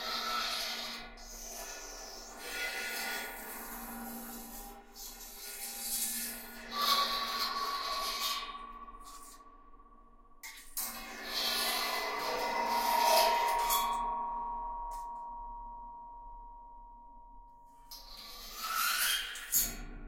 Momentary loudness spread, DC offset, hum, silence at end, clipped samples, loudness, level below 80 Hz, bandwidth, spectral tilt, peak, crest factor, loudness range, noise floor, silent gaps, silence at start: 20 LU; under 0.1%; none; 0 s; under 0.1%; -34 LUFS; -56 dBFS; 16.5 kHz; 0 dB/octave; -14 dBFS; 24 dB; 12 LU; -58 dBFS; none; 0 s